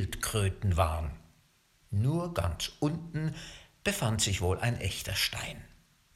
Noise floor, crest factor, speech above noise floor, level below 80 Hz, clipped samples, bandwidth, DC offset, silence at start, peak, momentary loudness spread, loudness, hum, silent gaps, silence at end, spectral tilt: -66 dBFS; 20 dB; 35 dB; -44 dBFS; under 0.1%; 16 kHz; under 0.1%; 0 s; -12 dBFS; 12 LU; -32 LUFS; none; none; 0.5 s; -4.5 dB/octave